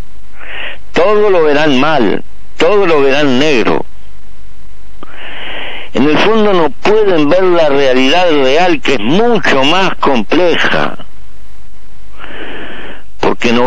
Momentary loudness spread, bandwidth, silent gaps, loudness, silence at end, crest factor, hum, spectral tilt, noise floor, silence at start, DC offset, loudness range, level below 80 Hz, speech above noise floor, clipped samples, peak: 16 LU; 10 kHz; none; -10 LUFS; 0 s; 8 dB; none; -5 dB/octave; -38 dBFS; 0.15 s; 30%; 6 LU; -38 dBFS; 29 dB; under 0.1%; 0 dBFS